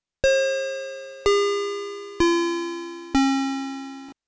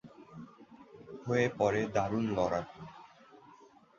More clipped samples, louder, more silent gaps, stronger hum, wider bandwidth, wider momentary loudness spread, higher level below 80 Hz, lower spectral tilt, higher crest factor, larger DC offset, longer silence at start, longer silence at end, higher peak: neither; first, -24 LUFS vs -32 LUFS; neither; neither; about the same, 8 kHz vs 7.6 kHz; second, 13 LU vs 24 LU; first, -48 dBFS vs -62 dBFS; second, -3.5 dB/octave vs -6.5 dB/octave; second, 14 dB vs 20 dB; neither; first, 0.25 s vs 0.05 s; second, 0.15 s vs 0.45 s; first, -10 dBFS vs -14 dBFS